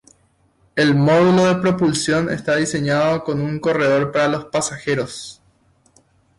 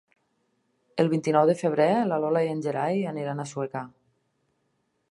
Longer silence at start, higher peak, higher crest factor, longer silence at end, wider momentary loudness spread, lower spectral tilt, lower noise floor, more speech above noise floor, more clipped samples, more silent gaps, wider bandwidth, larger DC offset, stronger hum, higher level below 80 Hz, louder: second, 0.75 s vs 0.95 s; about the same, -6 dBFS vs -8 dBFS; second, 12 dB vs 20 dB; second, 1.05 s vs 1.2 s; about the same, 9 LU vs 11 LU; second, -5.5 dB/octave vs -7 dB/octave; second, -59 dBFS vs -74 dBFS; second, 42 dB vs 49 dB; neither; neither; about the same, 11.5 kHz vs 11.5 kHz; neither; neither; first, -52 dBFS vs -78 dBFS; first, -18 LUFS vs -25 LUFS